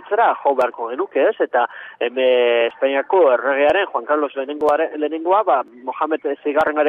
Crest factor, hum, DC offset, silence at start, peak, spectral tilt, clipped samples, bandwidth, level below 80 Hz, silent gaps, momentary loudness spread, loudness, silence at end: 14 dB; none; under 0.1%; 0 s; -4 dBFS; -5 dB/octave; under 0.1%; 6.2 kHz; -64 dBFS; none; 8 LU; -18 LUFS; 0 s